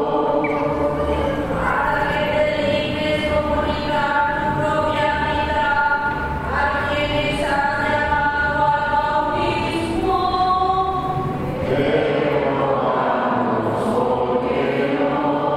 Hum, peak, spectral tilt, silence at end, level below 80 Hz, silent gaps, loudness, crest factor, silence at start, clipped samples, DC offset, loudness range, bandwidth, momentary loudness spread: none; -6 dBFS; -6.5 dB/octave; 0 s; -36 dBFS; none; -19 LUFS; 14 dB; 0 s; under 0.1%; under 0.1%; 1 LU; 14.5 kHz; 3 LU